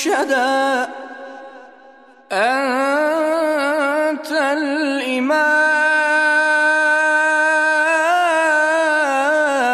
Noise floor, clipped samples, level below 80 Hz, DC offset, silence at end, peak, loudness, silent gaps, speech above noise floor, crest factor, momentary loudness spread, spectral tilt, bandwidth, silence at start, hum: -45 dBFS; under 0.1%; -78 dBFS; under 0.1%; 0 s; -4 dBFS; -16 LUFS; none; 28 dB; 12 dB; 6 LU; -1.5 dB/octave; 14 kHz; 0 s; none